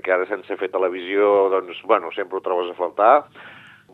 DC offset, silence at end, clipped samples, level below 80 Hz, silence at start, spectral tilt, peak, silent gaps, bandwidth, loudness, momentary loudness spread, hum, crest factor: under 0.1%; 0.4 s; under 0.1%; -78 dBFS; 0.05 s; -6 dB/octave; -2 dBFS; none; 4.2 kHz; -20 LUFS; 11 LU; none; 20 dB